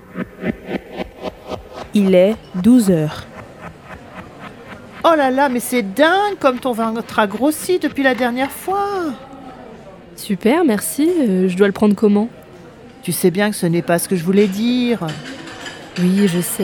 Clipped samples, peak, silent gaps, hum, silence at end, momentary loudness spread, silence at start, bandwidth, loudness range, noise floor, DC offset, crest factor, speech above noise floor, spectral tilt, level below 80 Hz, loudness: under 0.1%; 0 dBFS; none; none; 0 s; 21 LU; 0.1 s; 20 kHz; 3 LU; -39 dBFS; under 0.1%; 18 dB; 24 dB; -5.5 dB/octave; -50 dBFS; -17 LUFS